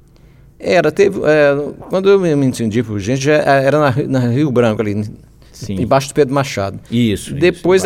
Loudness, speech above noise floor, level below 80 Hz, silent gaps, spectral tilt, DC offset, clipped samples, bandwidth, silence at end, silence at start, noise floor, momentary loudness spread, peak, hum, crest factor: -14 LUFS; 30 dB; -44 dBFS; none; -6 dB/octave; under 0.1%; under 0.1%; 15.5 kHz; 0 s; 0.6 s; -44 dBFS; 9 LU; 0 dBFS; none; 14 dB